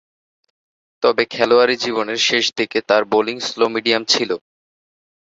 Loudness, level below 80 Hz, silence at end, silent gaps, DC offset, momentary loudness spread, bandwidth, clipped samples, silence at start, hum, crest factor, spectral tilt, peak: -17 LUFS; -64 dBFS; 0.95 s; none; under 0.1%; 7 LU; 7.8 kHz; under 0.1%; 1 s; none; 18 dB; -2.5 dB/octave; -2 dBFS